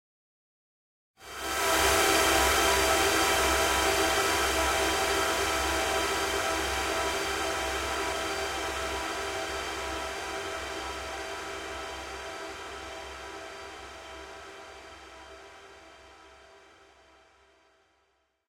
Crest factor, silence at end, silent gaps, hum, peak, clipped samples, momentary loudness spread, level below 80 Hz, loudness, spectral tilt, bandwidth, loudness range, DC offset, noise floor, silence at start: 20 dB; 1.9 s; none; none; -12 dBFS; under 0.1%; 20 LU; -46 dBFS; -27 LUFS; -2 dB/octave; 16 kHz; 19 LU; under 0.1%; -73 dBFS; 1.2 s